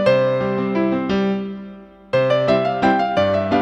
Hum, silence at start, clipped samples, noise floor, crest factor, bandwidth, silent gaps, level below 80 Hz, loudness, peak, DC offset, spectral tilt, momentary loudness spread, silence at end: none; 0 s; under 0.1%; -39 dBFS; 16 dB; 9 kHz; none; -50 dBFS; -18 LUFS; -2 dBFS; under 0.1%; -7.5 dB/octave; 9 LU; 0 s